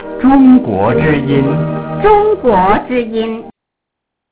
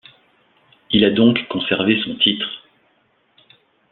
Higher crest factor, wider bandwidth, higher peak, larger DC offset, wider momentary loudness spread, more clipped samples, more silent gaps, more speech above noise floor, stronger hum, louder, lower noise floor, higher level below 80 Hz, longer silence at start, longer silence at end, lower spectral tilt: second, 12 dB vs 20 dB; about the same, 4 kHz vs 4.3 kHz; about the same, 0 dBFS vs -2 dBFS; first, 0.2% vs under 0.1%; about the same, 11 LU vs 11 LU; first, 0.2% vs under 0.1%; neither; first, 68 dB vs 45 dB; neither; first, -11 LUFS vs -17 LUFS; first, -77 dBFS vs -62 dBFS; first, -34 dBFS vs -56 dBFS; second, 0 s vs 0.9 s; second, 0.8 s vs 1.35 s; first, -11.5 dB/octave vs -9 dB/octave